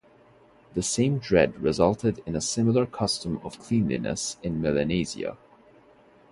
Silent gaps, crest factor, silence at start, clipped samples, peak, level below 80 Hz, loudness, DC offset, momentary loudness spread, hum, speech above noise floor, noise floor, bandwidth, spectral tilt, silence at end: none; 22 dB; 0.75 s; under 0.1%; -6 dBFS; -50 dBFS; -26 LUFS; under 0.1%; 9 LU; none; 31 dB; -56 dBFS; 11.5 kHz; -5 dB/octave; 0.95 s